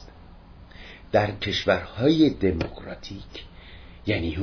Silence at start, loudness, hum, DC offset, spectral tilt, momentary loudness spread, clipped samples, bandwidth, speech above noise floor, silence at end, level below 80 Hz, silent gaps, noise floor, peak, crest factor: 0 s; -24 LUFS; none; under 0.1%; -6.5 dB/octave; 24 LU; under 0.1%; 5.4 kHz; 23 dB; 0 s; -44 dBFS; none; -47 dBFS; -8 dBFS; 18 dB